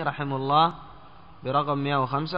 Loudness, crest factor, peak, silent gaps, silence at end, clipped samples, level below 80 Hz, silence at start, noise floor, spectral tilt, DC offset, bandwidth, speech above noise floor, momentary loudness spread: -25 LUFS; 18 dB; -8 dBFS; none; 0 s; under 0.1%; -58 dBFS; 0 s; -49 dBFS; -4.5 dB/octave; 0.4%; 5.4 kHz; 25 dB; 11 LU